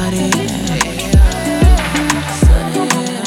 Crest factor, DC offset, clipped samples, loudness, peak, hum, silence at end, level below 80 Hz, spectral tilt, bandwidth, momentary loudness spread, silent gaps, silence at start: 12 dB; under 0.1%; under 0.1%; -14 LUFS; 0 dBFS; none; 0 s; -16 dBFS; -5 dB/octave; 16 kHz; 4 LU; none; 0 s